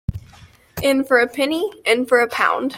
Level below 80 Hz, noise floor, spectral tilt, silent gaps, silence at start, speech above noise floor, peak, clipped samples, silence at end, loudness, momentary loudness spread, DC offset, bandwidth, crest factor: -42 dBFS; -47 dBFS; -4.5 dB/octave; none; 0.1 s; 29 dB; -2 dBFS; under 0.1%; 0 s; -18 LUFS; 13 LU; under 0.1%; 16.5 kHz; 16 dB